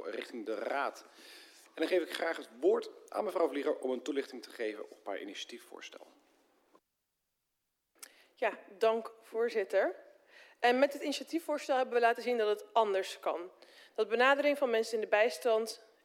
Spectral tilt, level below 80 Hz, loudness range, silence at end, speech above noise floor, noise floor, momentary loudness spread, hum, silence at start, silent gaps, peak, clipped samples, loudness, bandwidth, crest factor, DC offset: -2.5 dB/octave; under -90 dBFS; 14 LU; 0.3 s; 51 dB; -85 dBFS; 20 LU; none; 0 s; none; -14 dBFS; under 0.1%; -33 LUFS; 16 kHz; 20 dB; under 0.1%